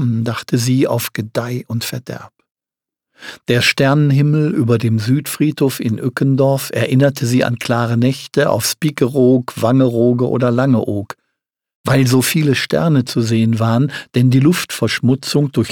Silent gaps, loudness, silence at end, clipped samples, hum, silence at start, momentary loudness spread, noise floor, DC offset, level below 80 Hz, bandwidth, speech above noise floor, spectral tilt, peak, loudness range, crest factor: 2.51-2.55 s, 11.75-11.84 s; -15 LUFS; 0 s; under 0.1%; none; 0 s; 9 LU; -87 dBFS; under 0.1%; -54 dBFS; 19 kHz; 73 dB; -6 dB/octave; 0 dBFS; 3 LU; 14 dB